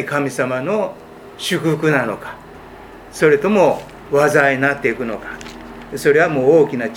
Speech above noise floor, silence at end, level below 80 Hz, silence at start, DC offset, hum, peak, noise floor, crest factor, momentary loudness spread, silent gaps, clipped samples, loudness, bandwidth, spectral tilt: 21 dB; 0 s; -50 dBFS; 0 s; under 0.1%; none; 0 dBFS; -37 dBFS; 18 dB; 19 LU; none; under 0.1%; -16 LUFS; 16.5 kHz; -5.5 dB/octave